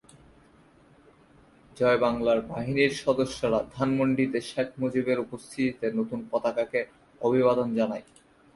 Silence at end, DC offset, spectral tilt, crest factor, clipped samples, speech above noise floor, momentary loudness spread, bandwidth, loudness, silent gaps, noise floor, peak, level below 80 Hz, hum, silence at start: 0.55 s; under 0.1%; -6 dB/octave; 18 dB; under 0.1%; 31 dB; 7 LU; 11.5 kHz; -27 LUFS; none; -58 dBFS; -10 dBFS; -58 dBFS; none; 1.75 s